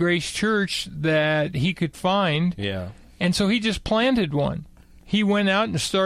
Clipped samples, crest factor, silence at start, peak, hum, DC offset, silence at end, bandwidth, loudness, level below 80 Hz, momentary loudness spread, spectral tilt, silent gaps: under 0.1%; 14 dB; 0 s; -8 dBFS; none; under 0.1%; 0 s; 14 kHz; -22 LUFS; -46 dBFS; 7 LU; -5 dB/octave; none